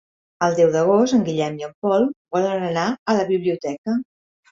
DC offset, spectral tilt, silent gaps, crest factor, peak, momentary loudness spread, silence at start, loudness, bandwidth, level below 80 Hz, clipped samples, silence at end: under 0.1%; -6 dB/octave; 1.75-1.82 s, 2.16-2.25 s, 2.99-3.06 s, 3.78-3.84 s; 16 dB; -4 dBFS; 9 LU; 0.4 s; -20 LUFS; 7.6 kHz; -62 dBFS; under 0.1%; 0.5 s